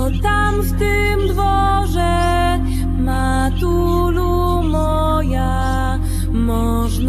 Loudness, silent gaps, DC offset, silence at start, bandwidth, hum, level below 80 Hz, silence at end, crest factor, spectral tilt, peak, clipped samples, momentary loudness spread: -17 LUFS; none; under 0.1%; 0 s; 14 kHz; none; -20 dBFS; 0 s; 12 dB; -6.5 dB/octave; -4 dBFS; under 0.1%; 3 LU